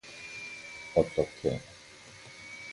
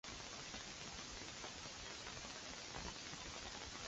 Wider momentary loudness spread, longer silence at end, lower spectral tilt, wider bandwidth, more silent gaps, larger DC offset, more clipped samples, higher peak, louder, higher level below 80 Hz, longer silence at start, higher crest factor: first, 20 LU vs 1 LU; about the same, 0 s vs 0 s; first, -5.5 dB/octave vs -1.5 dB/octave; first, 11.5 kHz vs 8 kHz; neither; neither; neither; first, -10 dBFS vs -32 dBFS; first, -33 LUFS vs -49 LUFS; first, -56 dBFS vs -64 dBFS; about the same, 0.05 s vs 0.05 s; about the same, 24 dB vs 20 dB